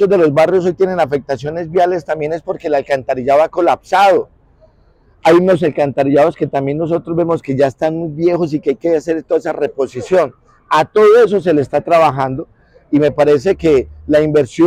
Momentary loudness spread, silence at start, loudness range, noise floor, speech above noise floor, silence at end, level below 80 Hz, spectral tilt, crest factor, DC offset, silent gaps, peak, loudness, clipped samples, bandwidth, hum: 8 LU; 0 s; 3 LU; -50 dBFS; 37 dB; 0 s; -46 dBFS; -7 dB/octave; 10 dB; under 0.1%; none; -4 dBFS; -14 LUFS; under 0.1%; 13 kHz; none